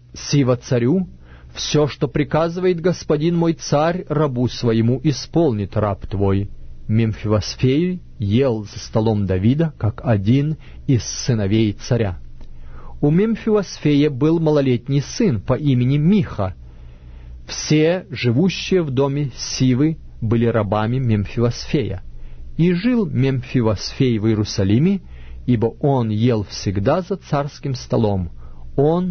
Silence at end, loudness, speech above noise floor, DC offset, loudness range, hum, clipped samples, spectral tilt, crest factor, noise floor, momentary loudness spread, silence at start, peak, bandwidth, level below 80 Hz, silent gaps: 0 s; -19 LUFS; 20 dB; under 0.1%; 2 LU; none; under 0.1%; -6.5 dB/octave; 14 dB; -38 dBFS; 8 LU; 0.15 s; -4 dBFS; 6.6 kHz; -38 dBFS; none